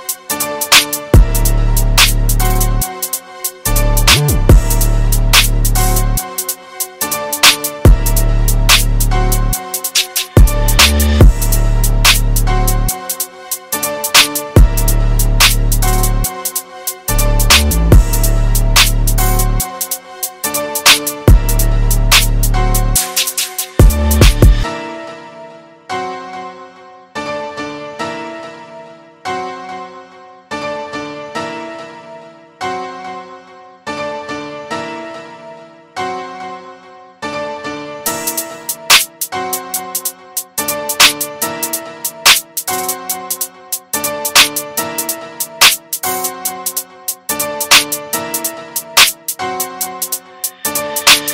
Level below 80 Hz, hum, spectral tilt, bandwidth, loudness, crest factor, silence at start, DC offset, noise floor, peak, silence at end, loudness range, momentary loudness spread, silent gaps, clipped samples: -16 dBFS; none; -2.5 dB/octave; over 20 kHz; -13 LUFS; 14 dB; 0 s; under 0.1%; -38 dBFS; 0 dBFS; 0 s; 13 LU; 16 LU; none; 0.2%